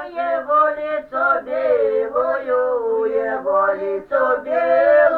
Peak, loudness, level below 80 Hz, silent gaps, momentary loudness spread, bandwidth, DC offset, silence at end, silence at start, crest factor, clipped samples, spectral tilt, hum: -4 dBFS; -19 LUFS; -58 dBFS; none; 6 LU; 4.6 kHz; under 0.1%; 0 s; 0 s; 14 dB; under 0.1%; -6.5 dB/octave; none